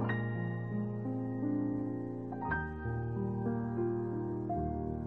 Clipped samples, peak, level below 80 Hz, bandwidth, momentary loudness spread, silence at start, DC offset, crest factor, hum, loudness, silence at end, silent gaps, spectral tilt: under 0.1%; -22 dBFS; -52 dBFS; 4 kHz; 4 LU; 0 s; 0.1%; 14 dB; none; -36 LUFS; 0 s; none; -11 dB/octave